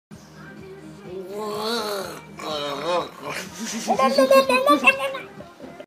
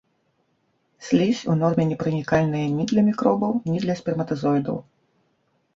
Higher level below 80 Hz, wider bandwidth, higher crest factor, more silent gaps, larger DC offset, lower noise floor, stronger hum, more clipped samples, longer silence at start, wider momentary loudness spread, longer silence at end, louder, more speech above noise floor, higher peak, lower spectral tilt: about the same, -62 dBFS vs -58 dBFS; first, 15.5 kHz vs 7.6 kHz; about the same, 20 dB vs 18 dB; neither; neither; second, -42 dBFS vs -69 dBFS; neither; neither; second, 0.1 s vs 1 s; first, 25 LU vs 6 LU; second, 0 s vs 0.95 s; about the same, -21 LUFS vs -22 LUFS; second, 24 dB vs 47 dB; first, -2 dBFS vs -6 dBFS; second, -3 dB/octave vs -7.5 dB/octave